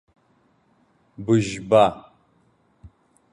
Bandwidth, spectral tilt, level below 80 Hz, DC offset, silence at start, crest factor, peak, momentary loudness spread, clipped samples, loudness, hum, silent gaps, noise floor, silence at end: 11 kHz; -6.5 dB/octave; -56 dBFS; under 0.1%; 1.2 s; 20 dB; -4 dBFS; 17 LU; under 0.1%; -20 LUFS; none; none; -63 dBFS; 0.45 s